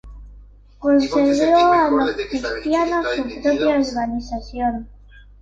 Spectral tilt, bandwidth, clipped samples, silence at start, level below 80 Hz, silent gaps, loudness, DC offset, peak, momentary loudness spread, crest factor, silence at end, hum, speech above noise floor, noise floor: -5 dB/octave; 7.8 kHz; under 0.1%; 0.05 s; -42 dBFS; none; -19 LUFS; under 0.1%; -6 dBFS; 10 LU; 14 dB; 0.2 s; 50 Hz at -45 dBFS; 26 dB; -44 dBFS